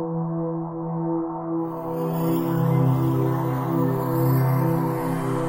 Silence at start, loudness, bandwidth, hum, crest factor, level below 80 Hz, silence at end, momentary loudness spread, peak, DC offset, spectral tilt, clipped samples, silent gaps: 0 s; -24 LUFS; 16 kHz; none; 14 dB; -54 dBFS; 0 s; 7 LU; -10 dBFS; under 0.1%; -9 dB/octave; under 0.1%; none